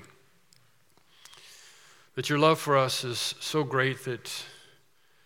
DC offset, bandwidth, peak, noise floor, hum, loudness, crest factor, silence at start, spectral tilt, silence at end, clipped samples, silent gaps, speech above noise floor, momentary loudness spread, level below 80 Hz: under 0.1%; 17 kHz; -8 dBFS; -66 dBFS; none; -27 LUFS; 24 dB; 0 s; -4 dB/octave; 0.7 s; under 0.1%; none; 39 dB; 26 LU; -80 dBFS